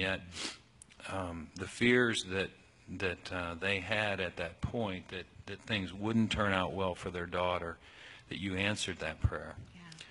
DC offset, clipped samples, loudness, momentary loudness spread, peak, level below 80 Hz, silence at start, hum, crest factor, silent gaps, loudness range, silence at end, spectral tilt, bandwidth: under 0.1%; under 0.1%; -35 LUFS; 17 LU; -14 dBFS; -52 dBFS; 0 s; none; 22 dB; none; 3 LU; 0 s; -4.5 dB/octave; 11 kHz